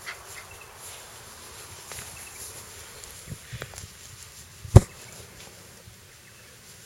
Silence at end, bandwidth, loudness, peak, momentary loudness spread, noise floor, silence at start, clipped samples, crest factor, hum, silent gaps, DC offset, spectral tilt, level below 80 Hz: 1.65 s; 16.5 kHz; -26 LUFS; 0 dBFS; 24 LU; -50 dBFS; 0.05 s; under 0.1%; 30 dB; none; none; under 0.1%; -6 dB/octave; -38 dBFS